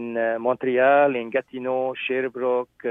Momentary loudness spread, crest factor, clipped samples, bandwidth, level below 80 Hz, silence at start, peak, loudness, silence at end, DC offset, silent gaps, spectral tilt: 9 LU; 16 dB; under 0.1%; 3.8 kHz; -70 dBFS; 0 s; -6 dBFS; -23 LUFS; 0 s; under 0.1%; none; -8 dB/octave